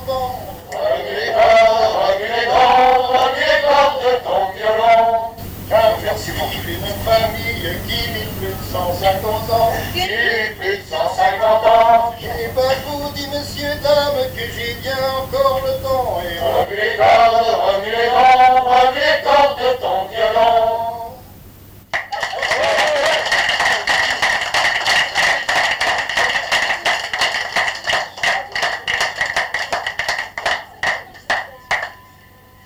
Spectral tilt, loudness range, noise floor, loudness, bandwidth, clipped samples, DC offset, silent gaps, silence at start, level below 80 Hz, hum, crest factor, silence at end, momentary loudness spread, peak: -3 dB/octave; 6 LU; -45 dBFS; -16 LUFS; over 20 kHz; under 0.1%; under 0.1%; none; 0 s; -40 dBFS; none; 14 dB; 0.7 s; 11 LU; -2 dBFS